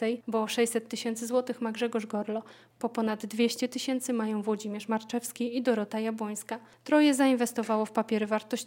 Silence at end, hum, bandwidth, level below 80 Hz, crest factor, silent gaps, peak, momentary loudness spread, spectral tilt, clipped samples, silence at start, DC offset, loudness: 0 s; none; 17 kHz; -78 dBFS; 18 dB; none; -10 dBFS; 10 LU; -4 dB/octave; under 0.1%; 0 s; under 0.1%; -30 LUFS